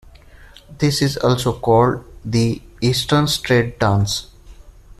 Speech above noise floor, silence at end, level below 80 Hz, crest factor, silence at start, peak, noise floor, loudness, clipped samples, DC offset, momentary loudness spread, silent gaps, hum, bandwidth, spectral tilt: 26 dB; 0.05 s; -40 dBFS; 16 dB; 0.4 s; -2 dBFS; -43 dBFS; -18 LUFS; under 0.1%; under 0.1%; 7 LU; none; none; 14 kHz; -5.5 dB/octave